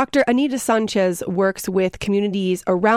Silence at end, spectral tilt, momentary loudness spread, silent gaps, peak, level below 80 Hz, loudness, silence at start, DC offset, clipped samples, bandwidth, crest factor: 0 s; -5 dB/octave; 4 LU; none; -4 dBFS; -52 dBFS; -20 LUFS; 0 s; under 0.1%; under 0.1%; 16 kHz; 14 dB